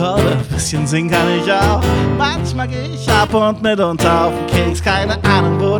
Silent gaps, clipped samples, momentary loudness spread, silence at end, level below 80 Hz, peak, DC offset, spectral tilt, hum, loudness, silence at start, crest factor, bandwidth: none; under 0.1%; 5 LU; 0 s; -32 dBFS; -2 dBFS; under 0.1%; -5.5 dB/octave; none; -15 LUFS; 0 s; 14 dB; over 20 kHz